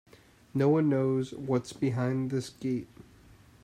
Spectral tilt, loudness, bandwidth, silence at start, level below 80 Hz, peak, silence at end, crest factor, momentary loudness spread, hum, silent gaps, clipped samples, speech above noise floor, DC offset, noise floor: -7.5 dB/octave; -30 LUFS; 13 kHz; 0.55 s; -66 dBFS; -14 dBFS; 0.6 s; 16 dB; 10 LU; none; none; under 0.1%; 28 dB; under 0.1%; -56 dBFS